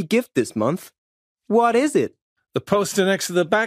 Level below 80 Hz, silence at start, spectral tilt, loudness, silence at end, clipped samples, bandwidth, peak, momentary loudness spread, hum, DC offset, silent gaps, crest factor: -64 dBFS; 0 s; -4.5 dB/octave; -21 LUFS; 0 s; under 0.1%; 15.5 kHz; -4 dBFS; 11 LU; none; under 0.1%; 0.98-1.36 s, 2.22-2.36 s; 18 dB